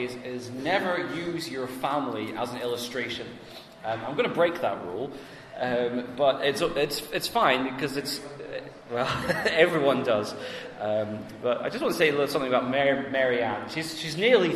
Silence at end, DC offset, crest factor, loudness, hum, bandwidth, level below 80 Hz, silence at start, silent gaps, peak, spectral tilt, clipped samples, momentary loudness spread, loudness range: 0 s; under 0.1%; 22 dB; -27 LUFS; none; 14 kHz; -60 dBFS; 0 s; none; -6 dBFS; -4.5 dB/octave; under 0.1%; 13 LU; 4 LU